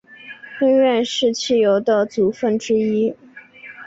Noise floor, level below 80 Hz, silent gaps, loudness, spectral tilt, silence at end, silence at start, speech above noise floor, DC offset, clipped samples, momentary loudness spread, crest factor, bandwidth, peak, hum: -41 dBFS; -62 dBFS; none; -18 LUFS; -4.5 dB/octave; 0 s; 0.1 s; 24 dB; under 0.1%; under 0.1%; 22 LU; 12 dB; 8 kHz; -6 dBFS; none